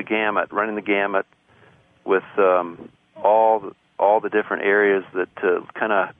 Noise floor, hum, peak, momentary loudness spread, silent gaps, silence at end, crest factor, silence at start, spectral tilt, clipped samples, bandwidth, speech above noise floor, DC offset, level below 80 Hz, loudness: -54 dBFS; none; -4 dBFS; 9 LU; none; 0.1 s; 16 dB; 0 s; -8 dB/octave; under 0.1%; 3.7 kHz; 34 dB; under 0.1%; -68 dBFS; -20 LUFS